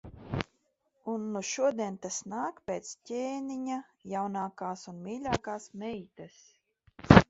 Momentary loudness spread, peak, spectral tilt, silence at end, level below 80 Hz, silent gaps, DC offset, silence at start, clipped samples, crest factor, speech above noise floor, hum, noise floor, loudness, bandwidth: 12 LU; 0 dBFS; -5.5 dB/octave; 0.05 s; -48 dBFS; none; under 0.1%; 0.05 s; under 0.1%; 32 dB; 40 dB; none; -75 dBFS; -34 LUFS; 8 kHz